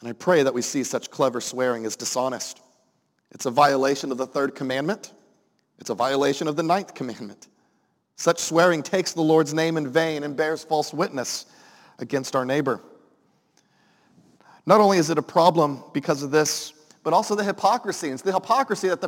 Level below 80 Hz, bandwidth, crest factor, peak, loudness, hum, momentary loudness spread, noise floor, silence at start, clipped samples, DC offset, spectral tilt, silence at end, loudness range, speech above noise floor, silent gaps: -76 dBFS; 17 kHz; 22 dB; -2 dBFS; -23 LUFS; none; 13 LU; -69 dBFS; 0 s; under 0.1%; under 0.1%; -4 dB/octave; 0 s; 6 LU; 46 dB; none